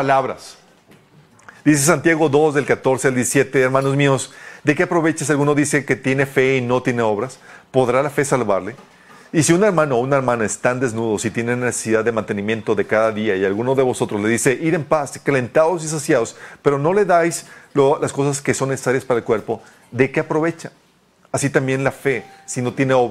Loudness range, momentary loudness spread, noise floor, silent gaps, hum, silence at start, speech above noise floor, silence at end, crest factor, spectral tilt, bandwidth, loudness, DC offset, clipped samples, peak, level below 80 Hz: 4 LU; 7 LU; -55 dBFS; none; none; 0 s; 37 dB; 0 s; 18 dB; -5 dB/octave; 15 kHz; -18 LUFS; under 0.1%; under 0.1%; 0 dBFS; -54 dBFS